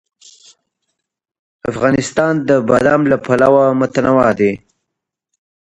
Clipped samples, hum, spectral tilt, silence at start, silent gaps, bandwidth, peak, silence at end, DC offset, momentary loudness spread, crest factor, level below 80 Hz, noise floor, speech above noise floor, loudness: under 0.1%; none; -6.5 dB/octave; 1.65 s; none; 11 kHz; 0 dBFS; 1.25 s; under 0.1%; 6 LU; 16 dB; -48 dBFS; -79 dBFS; 66 dB; -13 LUFS